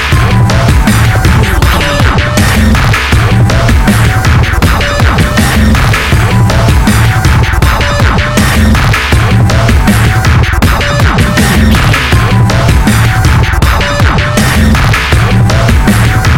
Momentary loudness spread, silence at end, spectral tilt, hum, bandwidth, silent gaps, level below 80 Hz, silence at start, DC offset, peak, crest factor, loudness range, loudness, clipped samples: 1 LU; 0 s; -5.5 dB/octave; none; 17 kHz; none; -12 dBFS; 0 s; 0.5%; 0 dBFS; 6 dB; 0 LU; -7 LUFS; 0.2%